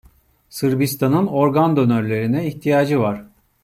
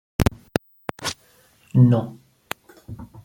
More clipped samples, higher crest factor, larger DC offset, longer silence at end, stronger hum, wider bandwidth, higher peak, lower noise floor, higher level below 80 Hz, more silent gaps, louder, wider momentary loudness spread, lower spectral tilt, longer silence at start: neither; second, 14 dB vs 22 dB; neither; first, 0.4 s vs 0.05 s; neither; about the same, 16 kHz vs 16.5 kHz; about the same, -4 dBFS vs -2 dBFS; second, -53 dBFS vs -57 dBFS; second, -56 dBFS vs -40 dBFS; neither; first, -18 LUFS vs -22 LUFS; second, 7 LU vs 23 LU; about the same, -7 dB/octave vs -6.5 dB/octave; first, 0.55 s vs 0.2 s